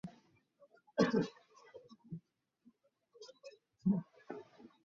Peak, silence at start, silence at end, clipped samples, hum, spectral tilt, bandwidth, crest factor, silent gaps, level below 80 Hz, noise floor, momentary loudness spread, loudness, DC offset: -18 dBFS; 0.05 s; 0.2 s; under 0.1%; none; -6.5 dB/octave; 7.4 kHz; 24 dB; none; -76 dBFS; -71 dBFS; 25 LU; -37 LUFS; under 0.1%